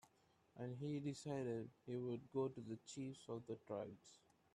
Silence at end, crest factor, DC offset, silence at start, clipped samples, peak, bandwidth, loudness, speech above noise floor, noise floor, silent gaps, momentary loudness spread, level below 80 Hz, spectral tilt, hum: 0.4 s; 18 dB; under 0.1%; 0.05 s; under 0.1%; -32 dBFS; 12.5 kHz; -49 LUFS; 29 dB; -77 dBFS; none; 9 LU; -84 dBFS; -6.5 dB/octave; none